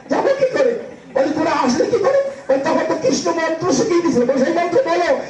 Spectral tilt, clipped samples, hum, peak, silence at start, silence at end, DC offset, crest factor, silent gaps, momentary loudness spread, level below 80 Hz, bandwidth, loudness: -4.5 dB/octave; under 0.1%; none; -4 dBFS; 0.05 s; 0 s; under 0.1%; 12 dB; none; 3 LU; -58 dBFS; 9.4 kHz; -17 LUFS